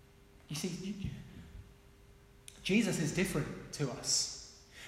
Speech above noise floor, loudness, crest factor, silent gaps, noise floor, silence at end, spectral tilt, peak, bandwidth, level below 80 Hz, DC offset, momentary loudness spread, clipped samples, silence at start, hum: 25 dB; -35 LUFS; 20 dB; none; -60 dBFS; 0 s; -3.5 dB/octave; -18 dBFS; 16 kHz; -58 dBFS; under 0.1%; 22 LU; under 0.1%; 0.2 s; none